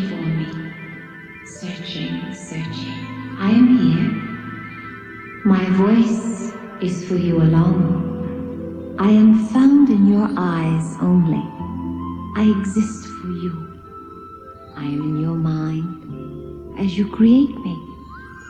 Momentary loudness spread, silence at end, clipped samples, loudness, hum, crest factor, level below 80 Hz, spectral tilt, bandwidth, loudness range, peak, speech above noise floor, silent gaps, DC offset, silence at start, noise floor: 21 LU; 0 s; under 0.1%; -18 LUFS; none; 16 dB; -48 dBFS; -7.5 dB/octave; 9.4 kHz; 10 LU; -2 dBFS; 23 dB; none; under 0.1%; 0 s; -39 dBFS